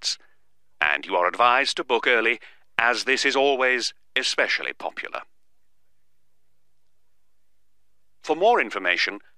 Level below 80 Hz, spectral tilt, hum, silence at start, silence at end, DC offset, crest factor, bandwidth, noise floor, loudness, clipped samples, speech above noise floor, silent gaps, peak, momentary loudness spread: -72 dBFS; -1 dB/octave; none; 0 s; 0.2 s; 0.3%; 24 dB; 13.5 kHz; -77 dBFS; -22 LUFS; under 0.1%; 54 dB; none; -2 dBFS; 12 LU